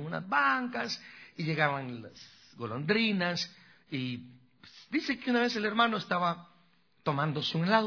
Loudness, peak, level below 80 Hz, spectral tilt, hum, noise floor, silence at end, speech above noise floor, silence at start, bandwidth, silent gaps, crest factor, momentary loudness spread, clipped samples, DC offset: -31 LUFS; -10 dBFS; -74 dBFS; -5.5 dB/octave; none; -68 dBFS; 0 s; 37 dB; 0 s; 5.4 kHz; none; 22 dB; 15 LU; under 0.1%; under 0.1%